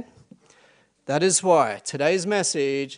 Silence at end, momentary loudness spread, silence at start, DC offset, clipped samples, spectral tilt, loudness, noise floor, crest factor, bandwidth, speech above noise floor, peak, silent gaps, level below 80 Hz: 0 s; 8 LU; 0 s; under 0.1%; under 0.1%; -3.5 dB/octave; -22 LUFS; -59 dBFS; 18 dB; 10.5 kHz; 37 dB; -6 dBFS; none; -72 dBFS